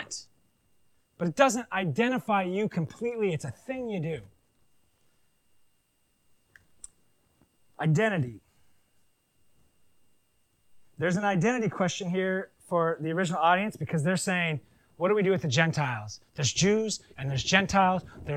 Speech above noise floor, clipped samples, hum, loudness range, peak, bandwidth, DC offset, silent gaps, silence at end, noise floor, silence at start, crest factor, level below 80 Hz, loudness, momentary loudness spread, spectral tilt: 44 dB; under 0.1%; none; 10 LU; -6 dBFS; 14 kHz; under 0.1%; none; 0 s; -71 dBFS; 0 s; 24 dB; -60 dBFS; -28 LUFS; 10 LU; -5 dB/octave